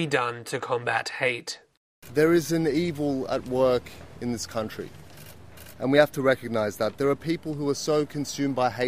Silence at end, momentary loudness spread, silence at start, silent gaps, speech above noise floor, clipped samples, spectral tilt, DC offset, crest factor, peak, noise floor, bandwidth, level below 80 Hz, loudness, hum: 0 s; 18 LU; 0 s; 1.77-2.02 s; 21 dB; under 0.1%; -5 dB/octave; 0.3%; 20 dB; -6 dBFS; -47 dBFS; 16 kHz; -58 dBFS; -26 LUFS; none